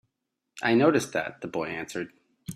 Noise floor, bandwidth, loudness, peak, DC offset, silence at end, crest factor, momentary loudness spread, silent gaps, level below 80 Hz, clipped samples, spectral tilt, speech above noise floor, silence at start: -83 dBFS; 14.5 kHz; -27 LUFS; -8 dBFS; under 0.1%; 0 s; 20 dB; 16 LU; none; -68 dBFS; under 0.1%; -5 dB/octave; 57 dB; 0.55 s